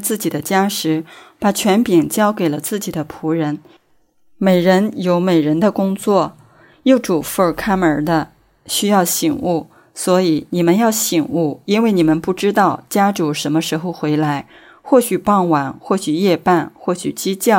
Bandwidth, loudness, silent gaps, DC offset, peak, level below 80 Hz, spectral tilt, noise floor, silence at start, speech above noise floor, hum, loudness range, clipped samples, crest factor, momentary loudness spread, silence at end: 16.5 kHz; -16 LUFS; none; under 0.1%; -2 dBFS; -52 dBFS; -5 dB/octave; -55 dBFS; 0 s; 39 dB; none; 2 LU; under 0.1%; 16 dB; 8 LU; 0 s